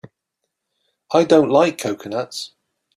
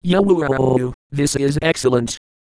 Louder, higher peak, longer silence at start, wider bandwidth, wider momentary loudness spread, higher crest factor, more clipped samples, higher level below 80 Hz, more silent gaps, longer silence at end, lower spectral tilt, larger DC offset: about the same, -18 LUFS vs -18 LUFS; about the same, -2 dBFS vs -2 dBFS; first, 1.1 s vs 0.05 s; first, 14.5 kHz vs 11 kHz; first, 16 LU vs 9 LU; about the same, 18 dB vs 16 dB; neither; second, -64 dBFS vs -42 dBFS; second, none vs 0.94-1.10 s; about the same, 0.5 s vs 0.4 s; about the same, -5 dB/octave vs -5.5 dB/octave; neither